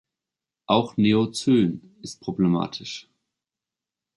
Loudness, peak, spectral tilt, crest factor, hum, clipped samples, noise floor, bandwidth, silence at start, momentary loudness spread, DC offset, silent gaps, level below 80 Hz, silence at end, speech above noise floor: -23 LUFS; -4 dBFS; -6 dB/octave; 20 dB; none; under 0.1%; -89 dBFS; 11.5 kHz; 0.7 s; 16 LU; under 0.1%; none; -60 dBFS; 1.15 s; 66 dB